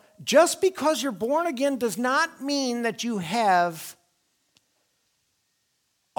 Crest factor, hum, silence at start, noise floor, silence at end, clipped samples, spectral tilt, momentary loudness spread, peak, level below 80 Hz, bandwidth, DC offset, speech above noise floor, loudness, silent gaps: 20 dB; none; 0.2 s; -73 dBFS; 2.25 s; under 0.1%; -3 dB/octave; 8 LU; -6 dBFS; -74 dBFS; 19.5 kHz; under 0.1%; 49 dB; -24 LUFS; none